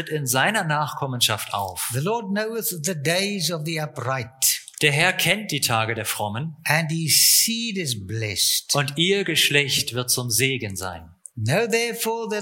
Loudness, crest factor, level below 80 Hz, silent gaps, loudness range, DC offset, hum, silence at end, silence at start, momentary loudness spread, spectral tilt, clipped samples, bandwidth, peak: -21 LUFS; 20 dB; -60 dBFS; none; 5 LU; under 0.1%; none; 0 s; 0 s; 10 LU; -2.5 dB/octave; under 0.1%; 17 kHz; -2 dBFS